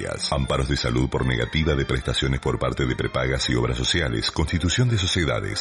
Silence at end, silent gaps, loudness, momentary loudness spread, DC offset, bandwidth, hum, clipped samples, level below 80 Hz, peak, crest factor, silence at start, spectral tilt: 0 s; none; -23 LUFS; 3 LU; under 0.1%; 11.5 kHz; none; under 0.1%; -32 dBFS; -8 dBFS; 14 dB; 0 s; -5 dB/octave